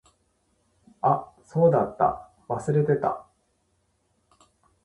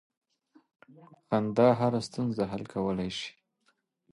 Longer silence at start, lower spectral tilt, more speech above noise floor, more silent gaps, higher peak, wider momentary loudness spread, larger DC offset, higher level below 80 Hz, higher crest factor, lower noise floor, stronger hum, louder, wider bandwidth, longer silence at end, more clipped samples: second, 1.05 s vs 1.3 s; first, -9 dB/octave vs -6.5 dB/octave; about the same, 48 dB vs 45 dB; neither; about the same, -8 dBFS vs -10 dBFS; about the same, 12 LU vs 11 LU; neither; about the same, -60 dBFS vs -62 dBFS; about the same, 20 dB vs 20 dB; second, -70 dBFS vs -74 dBFS; neither; first, -25 LUFS vs -29 LUFS; about the same, 11 kHz vs 11.5 kHz; first, 1.65 s vs 0.85 s; neither